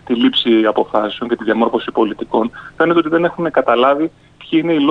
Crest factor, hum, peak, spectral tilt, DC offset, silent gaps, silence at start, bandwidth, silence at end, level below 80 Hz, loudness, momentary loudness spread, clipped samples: 14 dB; none; -2 dBFS; -7 dB/octave; under 0.1%; none; 0.05 s; 5 kHz; 0 s; -52 dBFS; -15 LUFS; 6 LU; under 0.1%